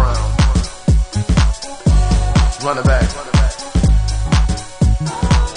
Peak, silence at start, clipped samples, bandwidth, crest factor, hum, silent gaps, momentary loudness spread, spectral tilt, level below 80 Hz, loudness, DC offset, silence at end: 0 dBFS; 0 s; under 0.1%; 10.5 kHz; 14 dB; none; none; 3 LU; -5.5 dB/octave; -16 dBFS; -16 LUFS; under 0.1%; 0 s